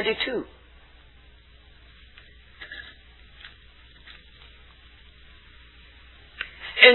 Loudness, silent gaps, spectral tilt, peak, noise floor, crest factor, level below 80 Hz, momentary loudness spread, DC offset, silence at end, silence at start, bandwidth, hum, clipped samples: -25 LUFS; none; -5 dB/octave; 0 dBFS; -52 dBFS; 28 dB; -54 dBFS; 23 LU; under 0.1%; 0 s; 0 s; 4.3 kHz; none; under 0.1%